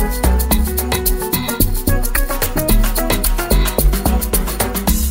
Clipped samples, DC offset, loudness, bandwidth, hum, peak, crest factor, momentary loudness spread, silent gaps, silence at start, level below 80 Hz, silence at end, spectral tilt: under 0.1%; under 0.1%; -17 LUFS; 16.5 kHz; none; 0 dBFS; 16 dB; 3 LU; none; 0 s; -18 dBFS; 0 s; -4 dB/octave